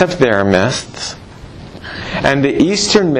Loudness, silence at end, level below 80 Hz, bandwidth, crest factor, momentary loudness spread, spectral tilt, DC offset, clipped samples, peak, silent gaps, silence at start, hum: -14 LUFS; 0 s; -40 dBFS; 11.5 kHz; 14 dB; 21 LU; -4.5 dB/octave; under 0.1%; under 0.1%; 0 dBFS; none; 0 s; none